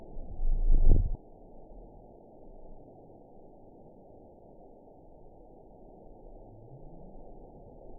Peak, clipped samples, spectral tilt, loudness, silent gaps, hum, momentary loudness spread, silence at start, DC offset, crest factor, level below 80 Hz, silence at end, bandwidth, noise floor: -10 dBFS; under 0.1%; -16 dB/octave; -33 LUFS; none; none; 24 LU; 0.15 s; under 0.1%; 20 dB; -32 dBFS; 6.85 s; 1 kHz; -53 dBFS